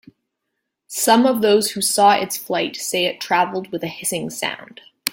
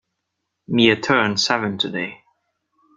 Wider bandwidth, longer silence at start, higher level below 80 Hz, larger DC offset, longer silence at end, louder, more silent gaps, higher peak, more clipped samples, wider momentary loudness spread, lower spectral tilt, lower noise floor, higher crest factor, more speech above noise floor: first, 17 kHz vs 9.2 kHz; first, 0.9 s vs 0.7 s; second, -66 dBFS vs -60 dBFS; neither; second, 0 s vs 0.8 s; about the same, -19 LUFS vs -19 LUFS; neither; about the same, 0 dBFS vs -2 dBFS; neither; about the same, 12 LU vs 10 LU; second, -2.5 dB/octave vs -4 dB/octave; about the same, -78 dBFS vs -78 dBFS; about the same, 20 dB vs 20 dB; about the same, 59 dB vs 59 dB